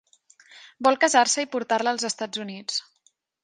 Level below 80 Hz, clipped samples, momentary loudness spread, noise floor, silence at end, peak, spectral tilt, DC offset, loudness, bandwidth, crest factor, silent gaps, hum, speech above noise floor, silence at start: -78 dBFS; under 0.1%; 12 LU; -66 dBFS; 0.6 s; -4 dBFS; -1.5 dB/octave; under 0.1%; -23 LUFS; 11 kHz; 22 dB; none; none; 43 dB; 0.55 s